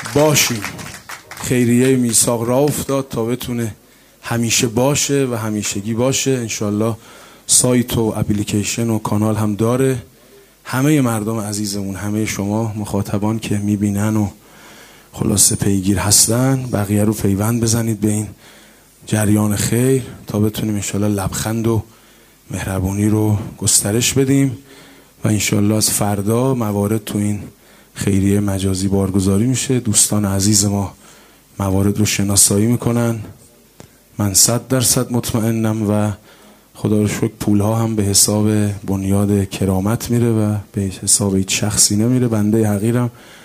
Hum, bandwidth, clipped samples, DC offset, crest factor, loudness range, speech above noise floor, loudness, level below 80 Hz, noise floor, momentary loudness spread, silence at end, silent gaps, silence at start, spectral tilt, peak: none; 16 kHz; under 0.1%; under 0.1%; 16 dB; 4 LU; 31 dB; -16 LUFS; -44 dBFS; -47 dBFS; 11 LU; 0.05 s; none; 0 s; -4.5 dB/octave; 0 dBFS